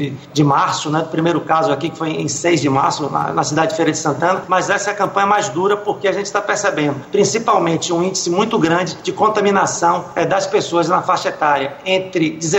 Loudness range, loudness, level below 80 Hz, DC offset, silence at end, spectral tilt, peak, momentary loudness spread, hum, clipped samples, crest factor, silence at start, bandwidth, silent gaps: 1 LU; -16 LUFS; -58 dBFS; under 0.1%; 0 s; -4.5 dB/octave; -2 dBFS; 4 LU; none; under 0.1%; 14 dB; 0 s; 16 kHz; none